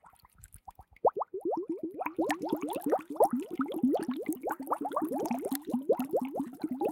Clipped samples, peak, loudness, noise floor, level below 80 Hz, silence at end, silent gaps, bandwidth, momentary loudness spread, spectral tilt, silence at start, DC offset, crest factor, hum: under 0.1%; -12 dBFS; -33 LUFS; -57 dBFS; -68 dBFS; 0 s; none; 17 kHz; 8 LU; -5.5 dB/octave; 0.05 s; under 0.1%; 20 dB; none